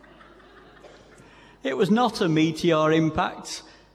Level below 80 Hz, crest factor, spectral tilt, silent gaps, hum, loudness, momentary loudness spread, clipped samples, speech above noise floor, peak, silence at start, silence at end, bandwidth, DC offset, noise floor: -54 dBFS; 16 dB; -6 dB/octave; none; none; -23 LUFS; 14 LU; under 0.1%; 28 dB; -10 dBFS; 0.85 s; 0.35 s; 13.5 kHz; under 0.1%; -50 dBFS